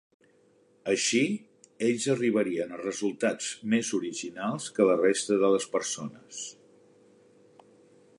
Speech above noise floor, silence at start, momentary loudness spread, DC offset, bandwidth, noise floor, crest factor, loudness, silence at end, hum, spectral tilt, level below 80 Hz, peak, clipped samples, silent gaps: 36 dB; 0.85 s; 13 LU; under 0.1%; 11.5 kHz; -63 dBFS; 20 dB; -28 LUFS; 1.65 s; none; -3.5 dB/octave; -76 dBFS; -8 dBFS; under 0.1%; none